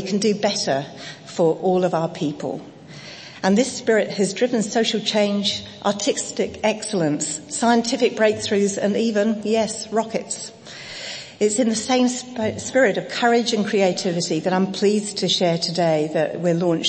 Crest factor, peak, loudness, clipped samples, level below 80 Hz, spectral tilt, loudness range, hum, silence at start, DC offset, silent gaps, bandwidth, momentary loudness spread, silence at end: 16 dB; -4 dBFS; -21 LUFS; under 0.1%; -64 dBFS; -4 dB/octave; 3 LU; none; 0 s; under 0.1%; none; 8.8 kHz; 11 LU; 0 s